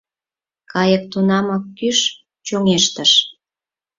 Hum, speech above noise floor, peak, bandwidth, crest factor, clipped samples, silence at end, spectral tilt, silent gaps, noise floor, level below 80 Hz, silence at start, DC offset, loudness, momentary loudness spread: none; over 74 dB; 0 dBFS; 7.8 kHz; 18 dB; under 0.1%; 0.65 s; -3.5 dB/octave; none; under -90 dBFS; -58 dBFS; 0.75 s; under 0.1%; -16 LUFS; 12 LU